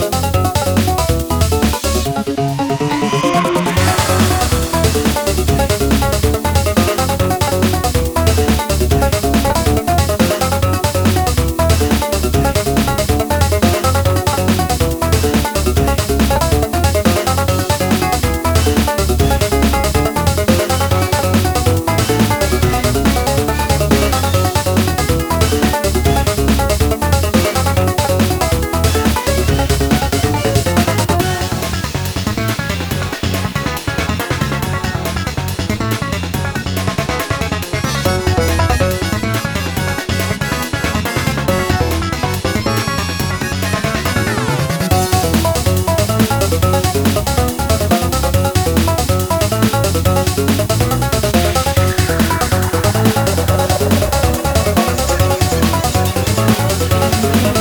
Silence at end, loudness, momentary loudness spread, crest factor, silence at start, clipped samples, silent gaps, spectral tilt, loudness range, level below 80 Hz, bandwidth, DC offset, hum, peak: 0 s; -15 LUFS; 4 LU; 14 dB; 0 s; under 0.1%; none; -5 dB/octave; 3 LU; -22 dBFS; over 20 kHz; under 0.1%; none; 0 dBFS